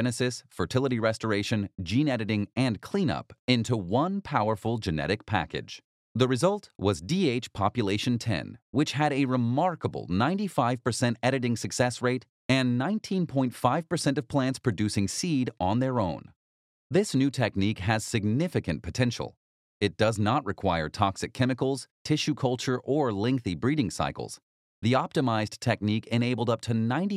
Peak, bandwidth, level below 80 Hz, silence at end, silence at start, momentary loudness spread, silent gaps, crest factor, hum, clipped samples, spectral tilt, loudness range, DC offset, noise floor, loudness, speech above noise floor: -8 dBFS; 14 kHz; -56 dBFS; 0 s; 0 s; 5 LU; 3.39-3.48 s, 5.84-6.15 s, 8.62-8.73 s, 12.29-12.49 s, 16.36-16.90 s, 19.37-19.80 s, 21.91-22.05 s, 24.42-24.82 s; 20 dB; none; under 0.1%; -5.5 dB/octave; 1 LU; under 0.1%; under -90 dBFS; -28 LUFS; over 63 dB